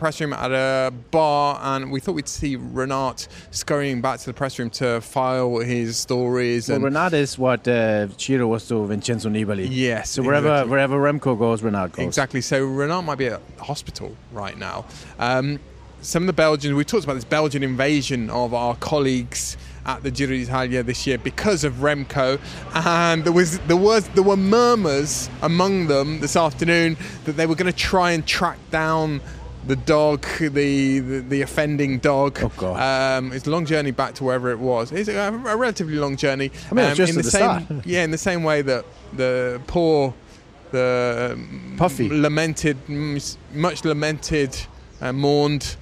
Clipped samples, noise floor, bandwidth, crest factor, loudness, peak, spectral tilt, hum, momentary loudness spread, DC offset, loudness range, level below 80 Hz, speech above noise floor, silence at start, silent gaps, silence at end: under 0.1%; -45 dBFS; 15.5 kHz; 18 dB; -21 LUFS; -4 dBFS; -5 dB/octave; none; 9 LU; under 0.1%; 5 LU; -44 dBFS; 24 dB; 0 s; none; 0 s